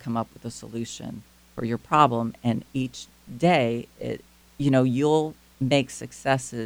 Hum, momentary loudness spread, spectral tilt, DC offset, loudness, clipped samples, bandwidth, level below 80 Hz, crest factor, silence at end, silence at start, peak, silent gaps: none; 17 LU; -6 dB/octave; under 0.1%; -25 LUFS; under 0.1%; over 20 kHz; -58 dBFS; 22 dB; 0 s; 0.05 s; -4 dBFS; none